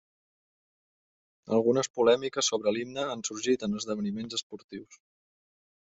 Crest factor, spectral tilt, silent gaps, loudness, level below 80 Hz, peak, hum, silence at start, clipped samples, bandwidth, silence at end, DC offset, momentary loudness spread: 20 dB; -3.5 dB/octave; 1.90-1.94 s, 4.43-4.50 s, 4.64-4.69 s; -29 LUFS; -70 dBFS; -10 dBFS; none; 1.45 s; under 0.1%; 8.2 kHz; 0.9 s; under 0.1%; 15 LU